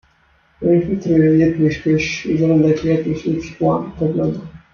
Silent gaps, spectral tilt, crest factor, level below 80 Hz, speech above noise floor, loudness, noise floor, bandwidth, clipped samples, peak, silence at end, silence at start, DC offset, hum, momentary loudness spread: none; -7.5 dB/octave; 14 dB; -44 dBFS; 40 dB; -17 LUFS; -56 dBFS; 7 kHz; under 0.1%; -4 dBFS; 0.15 s; 0.6 s; under 0.1%; none; 8 LU